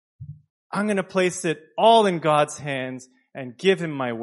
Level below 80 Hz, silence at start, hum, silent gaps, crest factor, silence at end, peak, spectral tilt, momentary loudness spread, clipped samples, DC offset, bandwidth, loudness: -68 dBFS; 0.2 s; none; 0.50-0.70 s; 20 dB; 0 s; -4 dBFS; -4.5 dB/octave; 23 LU; under 0.1%; under 0.1%; 11.5 kHz; -22 LUFS